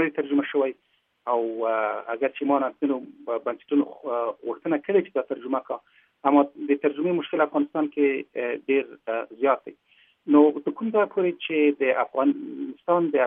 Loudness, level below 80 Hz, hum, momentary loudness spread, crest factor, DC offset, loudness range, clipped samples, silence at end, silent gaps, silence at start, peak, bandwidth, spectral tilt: -25 LUFS; -82 dBFS; none; 9 LU; 20 dB; under 0.1%; 4 LU; under 0.1%; 0 s; none; 0 s; -6 dBFS; 3.7 kHz; -10 dB/octave